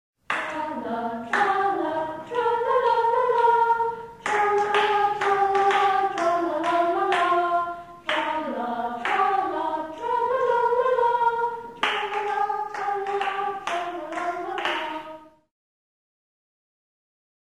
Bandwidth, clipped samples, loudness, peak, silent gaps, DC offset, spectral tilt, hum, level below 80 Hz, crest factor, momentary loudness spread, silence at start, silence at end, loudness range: 14 kHz; under 0.1%; -24 LUFS; -10 dBFS; none; under 0.1%; -3.5 dB/octave; none; -64 dBFS; 16 dB; 9 LU; 0.3 s; 2.25 s; 8 LU